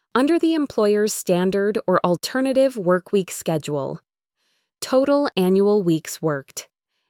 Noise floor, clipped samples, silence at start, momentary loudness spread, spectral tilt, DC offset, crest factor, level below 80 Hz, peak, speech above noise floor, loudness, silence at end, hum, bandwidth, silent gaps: -72 dBFS; under 0.1%; 0.15 s; 9 LU; -5.5 dB/octave; under 0.1%; 16 dB; -64 dBFS; -4 dBFS; 52 dB; -20 LUFS; 0.45 s; none; 18.5 kHz; none